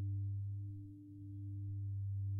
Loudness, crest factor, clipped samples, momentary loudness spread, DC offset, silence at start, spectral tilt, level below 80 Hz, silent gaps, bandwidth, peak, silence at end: -45 LUFS; 8 dB; under 0.1%; 10 LU; under 0.1%; 0 s; -12.5 dB/octave; -68 dBFS; none; 0.6 kHz; -36 dBFS; 0 s